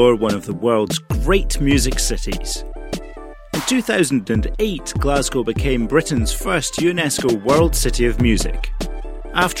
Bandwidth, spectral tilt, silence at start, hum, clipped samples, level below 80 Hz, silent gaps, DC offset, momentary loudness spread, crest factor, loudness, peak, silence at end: 16.5 kHz; -4.5 dB/octave; 0 s; none; under 0.1%; -24 dBFS; none; under 0.1%; 11 LU; 18 dB; -19 LUFS; 0 dBFS; 0 s